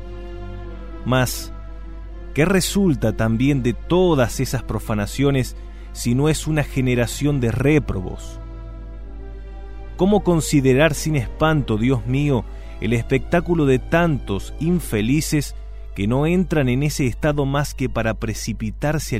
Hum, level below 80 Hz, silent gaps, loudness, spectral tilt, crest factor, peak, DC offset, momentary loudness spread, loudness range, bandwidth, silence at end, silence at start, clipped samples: none; -32 dBFS; none; -20 LUFS; -6 dB/octave; 18 dB; -2 dBFS; under 0.1%; 19 LU; 3 LU; 16 kHz; 0 s; 0 s; under 0.1%